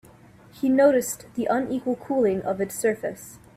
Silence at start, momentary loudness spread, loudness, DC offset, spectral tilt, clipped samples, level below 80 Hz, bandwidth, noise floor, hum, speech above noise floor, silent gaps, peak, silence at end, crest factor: 0.55 s; 12 LU; -24 LUFS; under 0.1%; -5 dB/octave; under 0.1%; -60 dBFS; 16 kHz; -50 dBFS; none; 27 dB; none; -8 dBFS; 0.2 s; 18 dB